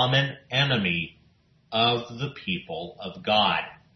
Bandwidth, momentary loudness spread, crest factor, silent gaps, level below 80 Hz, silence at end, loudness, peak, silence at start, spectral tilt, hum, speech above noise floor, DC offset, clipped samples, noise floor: 6.4 kHz; 13 LU; 18 dB; none; -60 dBFS; 0.2 s; -25 LUFS; -8 dBFS; 0 s; -5.5 dB/octave; none; 36 dB; under 0.1%; under 0.1%; -61 dBFS